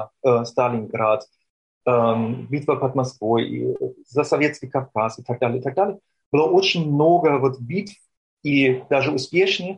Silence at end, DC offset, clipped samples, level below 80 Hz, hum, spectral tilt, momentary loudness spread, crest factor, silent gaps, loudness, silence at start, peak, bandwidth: 0 s; under 0.1%; under 0.1%; -64 dBFS; none; -6 dB/octave; 9 LU; 14 dB; 1.50-1.81 s, 6.26-6.32 s, 8.17-8.37 s; -21 LUFS; 0 s; -6 dBFS; 9.8 kHz